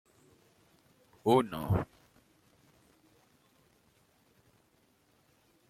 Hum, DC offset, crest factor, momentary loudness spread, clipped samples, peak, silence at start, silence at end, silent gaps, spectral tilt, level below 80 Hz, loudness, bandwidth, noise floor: none; under 0.1%; 24 dB; 9 LU; under 0.1%; -14 dBFS; 1.25 s; 3.85 s; none; -7.5 dB/octave; -60 dBFS; -31 LUFS; 16 kHz; -70 dBFS